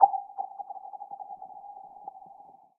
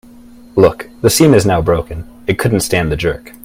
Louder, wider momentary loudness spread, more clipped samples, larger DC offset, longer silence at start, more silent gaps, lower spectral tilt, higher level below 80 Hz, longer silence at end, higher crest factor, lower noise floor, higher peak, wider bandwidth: second, -36 LUFS vs -13 LUFS; about the same, 13 LU vs 11 LU; neither; neither; second, 0 s vs 0.55 s; neither; first, -7 dB/octave vs -5 dB/octave; second, -86 dBFS vs -34 dBFS; first, 0.45 s vs 0.15 s; first, 28 dB vs 14 dB; first, -53 dBFS vs -38 dBFS; second, -4 dBFS vs 0 dBFS; second, 1.3 kHz vs 16.5 kHz